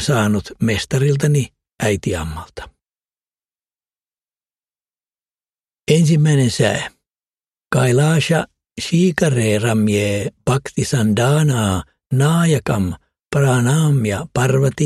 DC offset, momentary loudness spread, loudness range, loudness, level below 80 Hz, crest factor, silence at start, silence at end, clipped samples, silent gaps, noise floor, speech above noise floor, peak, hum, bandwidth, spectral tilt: under 0.1%; 10 LU; 7 LU; -17 LUFS; -44 dBFS; 18 dB; 0 s; 0 s; under 0.1%; none; under -90 dBFS; over 74 dB; 0 dBFS; none; 14 kHz; -6 dB/octave